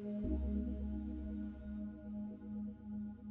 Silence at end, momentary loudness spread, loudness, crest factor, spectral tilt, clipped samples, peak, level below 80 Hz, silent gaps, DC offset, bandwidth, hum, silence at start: 0 s; 7 LU; -44 LUFS; 16 dB; -11 dB/octave; under 0.1%; -28 dBFS; -48 dBFS; none; under 0.1%; 3.7 kHz; none; 0 s